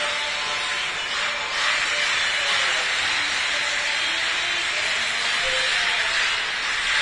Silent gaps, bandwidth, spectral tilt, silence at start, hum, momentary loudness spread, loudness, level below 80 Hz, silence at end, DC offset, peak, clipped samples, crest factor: none; 11 kHz; 1 dB/octave; 0 s; none; 4 LU; -21 LUFS; -54 dBFS; 0 s; under 0.1%; -8 dBFS; under 0.1%; 14 dB